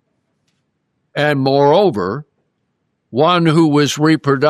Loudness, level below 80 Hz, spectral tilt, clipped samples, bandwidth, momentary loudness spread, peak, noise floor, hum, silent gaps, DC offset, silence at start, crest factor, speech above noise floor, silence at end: -14 LUFS; -62 dBFS; -6 dB/octave; under 0.1%; 13.5 kHz; 12 LU; -2 dBFS; -68 dBFS; none; none; under 0.1%; 1.15 s; 14 dB; 56 dB; 0 s